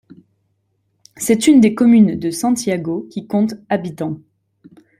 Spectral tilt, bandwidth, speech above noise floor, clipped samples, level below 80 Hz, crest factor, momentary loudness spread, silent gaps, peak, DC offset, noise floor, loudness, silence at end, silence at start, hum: -5.5 dB/octave; 15.5 kHz; 51 dB; under 0.1%; -56 dBFS; 16 dB; 14 LU; none; -2 dBFS; under 0.1%; -66 dBFS; -16 LUFS; 0.8 s; 1.2 s; none